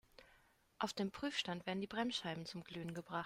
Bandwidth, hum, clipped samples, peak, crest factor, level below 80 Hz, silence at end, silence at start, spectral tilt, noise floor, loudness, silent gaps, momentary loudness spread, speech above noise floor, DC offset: 16 kHz; none; under 0.1%; -24 dBFS; 20 dB; -74 dBFS; 0 s; 0.2 s; -4.5 dB/octave; -72 dBFS; -43 LUFS; none; 7 LU; 29 dB; under 0.1%